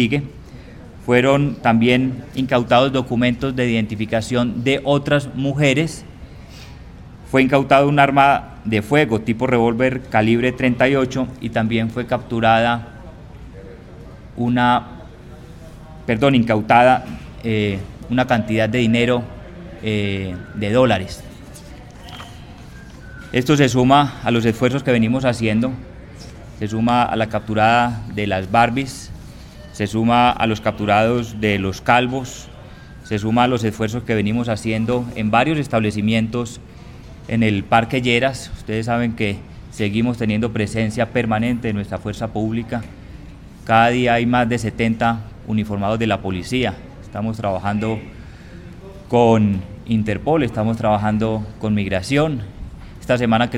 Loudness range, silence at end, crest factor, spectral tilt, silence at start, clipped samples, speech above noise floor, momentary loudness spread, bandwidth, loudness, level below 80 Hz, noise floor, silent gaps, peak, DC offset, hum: 4 LU; 0 s; 18 dB; -6.5 dB/octave; 0 s; under 0.1%; 20 dB; 23 LU; 14.5 kHz; -18 LUFS; -42 dBFS; -38 dBFS; none; 0 dBFS; under 0.1%; none